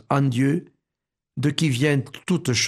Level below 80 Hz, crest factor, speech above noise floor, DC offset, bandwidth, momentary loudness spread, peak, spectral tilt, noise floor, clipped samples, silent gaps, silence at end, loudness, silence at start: -60 dBFS; 18 dB; 64 dB; under 0.1%; 13.5 kHz; 7 LU; -6 dBFS; -5 dB/octave; -85 dBFS; under 0.1%; none; 0 s; -23 LUFS; 0.1 s